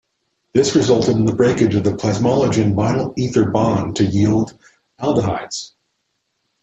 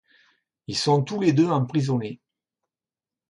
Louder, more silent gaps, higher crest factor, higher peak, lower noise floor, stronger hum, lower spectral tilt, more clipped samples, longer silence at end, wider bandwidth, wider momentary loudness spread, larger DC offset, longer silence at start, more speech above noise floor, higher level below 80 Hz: first, -17 LUFS vs -23 LUFS; neither; about the same, 16 dB vs 18 dB; first, -2 dBFS vs -8 dBFS; second, -71 dBFS vs under -90 dBFS; neither; about the same, -6.5 dB/octave vs -6.5 dB/octave; neither; second, 0.95 s vs 1.15 s; second, 8.4 kHz vs 11.5 kHz; second, 9 LU vs 12 LU; neither; second, 0.55 s vs 0.7 s; second, 55 dB vs over 68 dB; first, -48 dBFS vs -64 dBFS